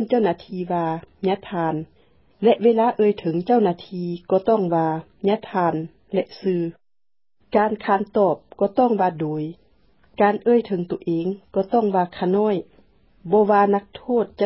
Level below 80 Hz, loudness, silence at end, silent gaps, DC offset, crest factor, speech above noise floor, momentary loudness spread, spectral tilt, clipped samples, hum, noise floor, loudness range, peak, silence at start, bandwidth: -60 dBFS; -21 LUFS; 0 s; none; under 0.1%; 16 dB; over 70 dB; 9 LU; -11.5 dB/octave; under 0.1%; none; under -90 dBFS; 3 LU; -4 dBFS; 0 s; 5.8 kHz